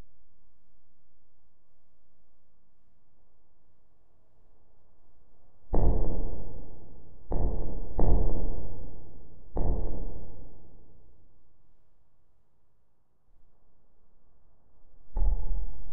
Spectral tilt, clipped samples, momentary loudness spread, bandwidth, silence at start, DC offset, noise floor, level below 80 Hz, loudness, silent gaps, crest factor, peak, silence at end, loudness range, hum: -10.5 dB/octave; under 0.1%; 23 LU; 1.8 kHz; 0 s; under 0.1%; -69 dBFS; -34 dBFS; -35 LUFS; none; 18 dB; -8 dBFS; 0 s; 8 LU; none